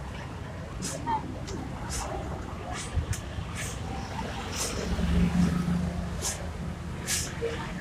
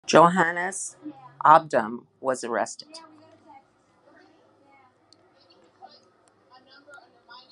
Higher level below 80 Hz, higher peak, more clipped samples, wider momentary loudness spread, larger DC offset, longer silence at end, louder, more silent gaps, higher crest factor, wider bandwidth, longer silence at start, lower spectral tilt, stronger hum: first, -40 dBFS vs -74 dBFS; second, -14 dBFS vs 0 dBFS; neither; second, 10 LU vs 26 LU; neither; second, 0 s vs 4.55 s; second, -32 LUFS vs -22 LUFS; neither; second, 18 dB vs 26 dB; first, 16 kHz vs 11.5 kHz; about the same, 0 s vs 0.1 s; about the same, -4.5 dB/octave vs -4 dB/octave; neither